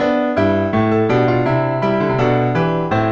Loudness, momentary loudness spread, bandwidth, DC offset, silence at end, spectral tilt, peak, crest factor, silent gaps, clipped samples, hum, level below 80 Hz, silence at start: -16 LUFS; 2 LU; 7.2 kHz; under 0.1%; 0 s; -8.5 dB/octave; -4 dBFS; 12 dB; none; under 0.1%; none; -44 dBFS; 0 s